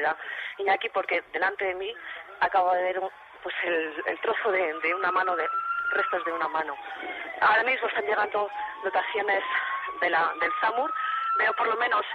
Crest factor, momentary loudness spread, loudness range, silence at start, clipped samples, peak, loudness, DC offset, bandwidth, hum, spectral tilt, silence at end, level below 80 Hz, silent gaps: 16 dB; 10 LU; 2 LU; 0 s; under 0.1%; -12 dBFS; -27 LUFS; under 0.1%; 6.6 kHz; none; -4.5 dB/octave; 0 s; -70 dBFS; none